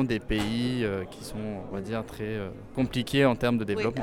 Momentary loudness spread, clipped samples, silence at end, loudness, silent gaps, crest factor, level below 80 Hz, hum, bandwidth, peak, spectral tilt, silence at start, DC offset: 12 LU; under 0.1%; 0 s; -29 LUFS; none; 18 dB; -46 dBFS; none; 16.5 kHz; -10 dBFS; -6 dB/octave; 0 s; under 0.1%